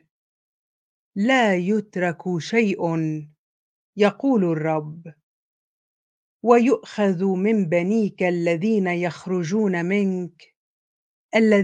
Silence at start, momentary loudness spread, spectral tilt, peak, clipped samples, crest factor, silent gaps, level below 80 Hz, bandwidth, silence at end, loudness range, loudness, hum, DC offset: 1.15 s; 10 LU; -7 dB/octave; -2 dBFS; under 0.1%; 22 dB; 3.38-3.93 s, 5.23-6.40 s, 10.56-11.29 s; -72 dBFS; 9.2 kHz; 0 s; 4 LU; -21 LUFS; none; under 0.1%